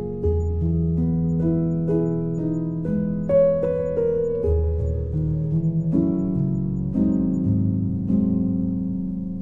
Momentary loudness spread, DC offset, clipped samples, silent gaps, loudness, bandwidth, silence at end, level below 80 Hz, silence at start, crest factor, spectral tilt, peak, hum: 4 LU; under 0.1%; under 0.1%; none; -23 LUFS; 2.6 kHz; 0 s; -36 dBFS; 0 s; 12 dB; -12.5 dB/octave; -8 dBFS; none